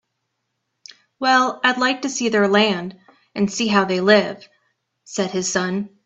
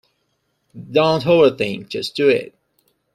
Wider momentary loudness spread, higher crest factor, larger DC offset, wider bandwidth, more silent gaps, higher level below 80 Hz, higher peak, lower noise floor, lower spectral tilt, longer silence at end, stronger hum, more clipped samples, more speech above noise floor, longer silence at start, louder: about the same, 13 LU vs 11 LU; about the same, 20 dB vs 16 dB; neither; second, 8.4 kHz vs 14 kHz; neither; second, -64 dBFS vs -58 dBFS; first, 0 dBFS vs -4 dBFS; first, -75 dBFS vs -69 dBFS; second, -3.5 dB/octave vs -6 dB/octave; second, 0.2 s vs 0.7 s; neither; neither; first, 56 dB vs 52 dB; first, 1.2 s vs 0.75 s; about the same, -19 LUFS vs -17 LUFS